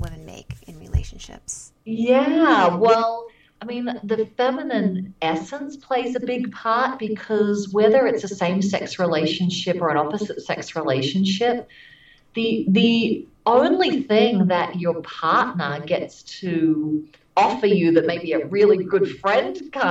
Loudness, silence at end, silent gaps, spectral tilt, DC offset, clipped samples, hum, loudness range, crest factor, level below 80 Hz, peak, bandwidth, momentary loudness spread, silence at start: -21 LUFS; 0 s; none; -6 dB/octave; under 0.1%; under 0.1%; none; 4 LU; 18 dB; -44 dBFS; -2 dBFS; 10 kHz; 15 LU; 0 s